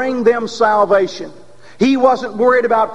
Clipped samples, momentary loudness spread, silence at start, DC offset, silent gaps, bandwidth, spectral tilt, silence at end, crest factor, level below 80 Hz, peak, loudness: under 0.1%; 8 LU; 0 s; 1%; none; 10.5 kHz; -5 dB/octave; 0 s; 14 dB; -56 dBFS; 0 dBFS; -14 LUFS